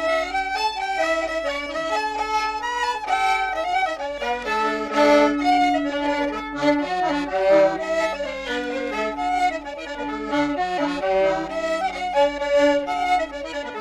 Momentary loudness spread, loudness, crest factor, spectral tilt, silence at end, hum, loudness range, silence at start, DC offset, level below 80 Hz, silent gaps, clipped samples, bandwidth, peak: 8 LU; -22 LUFS; 16 dB; -3.5 dB/octave; 0 s; none; 4 LU; 0 s; under 0.1%; -48 dBFS; none; under 0.1%; 13 kHz; -6 dBFS